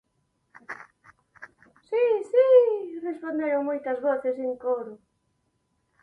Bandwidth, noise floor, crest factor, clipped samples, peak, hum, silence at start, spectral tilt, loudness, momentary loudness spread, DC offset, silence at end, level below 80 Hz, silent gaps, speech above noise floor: 4.4 kHz; -73 dBFS; 18 dB; under 0.1%; -8 dBFS; none; 0.7 s; -6 dB/octave; -24 LUFS; 23 LU; under 0.1%; 1.05 s; -76 dBFS; none; 45 dB